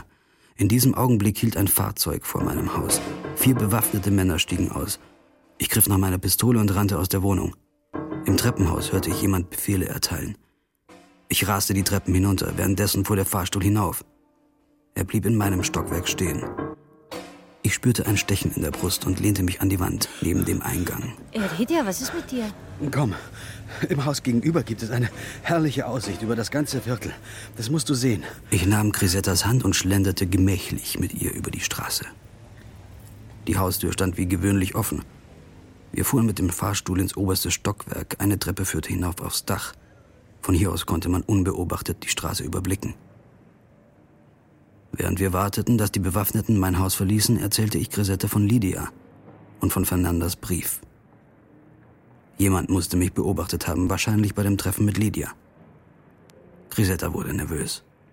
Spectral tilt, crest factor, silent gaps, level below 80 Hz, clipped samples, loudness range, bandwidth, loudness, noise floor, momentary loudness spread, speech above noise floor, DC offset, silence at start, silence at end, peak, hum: -5 dB/octave; 20 dB; none; -42 dBFS; under 0.1%; 5 LU; 17 kHz; -23 LUFS; -62 dBFS; 11 LU; 39 dB; under 0.1%; 0 s; 0.35 s; -4 dBFS; none